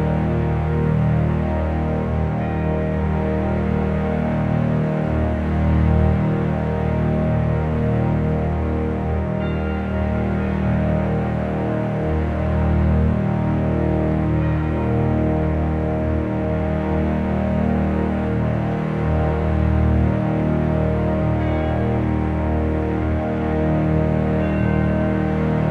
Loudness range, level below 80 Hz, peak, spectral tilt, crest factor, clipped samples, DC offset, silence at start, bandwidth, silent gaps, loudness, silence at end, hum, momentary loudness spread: 2 LU; -26 dBFS; -6 dBFS; -10 dB/octave; 14 dB; under 0.1%; under 0.1%; 0 s; 4.8 kHz; none; -20 LUFS; 0 s; none; 3 LU